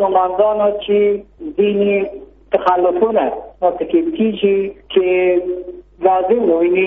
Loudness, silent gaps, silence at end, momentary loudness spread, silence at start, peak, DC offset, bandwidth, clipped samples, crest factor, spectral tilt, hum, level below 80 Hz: -16 LUFS; none; 0 s; 9 LU; 0 s; 0 dBFS; under 0.1%; 3.9 kHz; under 0.1%; 16 dB; -4.5 dB/octave; 50 Hz at -50 dBFS; -48 dBFS